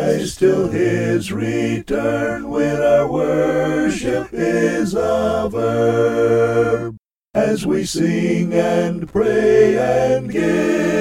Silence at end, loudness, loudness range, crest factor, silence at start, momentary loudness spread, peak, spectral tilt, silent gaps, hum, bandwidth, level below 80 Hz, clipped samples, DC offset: 0 s; -17 LUFS; 2 LU; 16 dB; 0 s; 5 LU; -2 dBFS; -6 dB/octave; none; none; 15.5 kHz; -44 dBFS; under 0.1%; under 0.1%